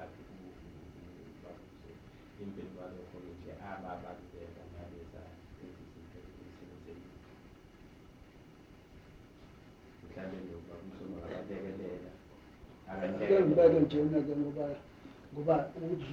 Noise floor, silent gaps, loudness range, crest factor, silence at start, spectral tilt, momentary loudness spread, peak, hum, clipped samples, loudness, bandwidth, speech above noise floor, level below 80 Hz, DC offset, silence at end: -57 dBFS; none; 24 LU; 24 dB; 0 s; -8.5 dB/octave; 27 LU; -12 dBFS; none; under 0.1%; -33 LUFS; 7.2 kHz; 23 dB; -62 dBFS; under 0.1%; 0 s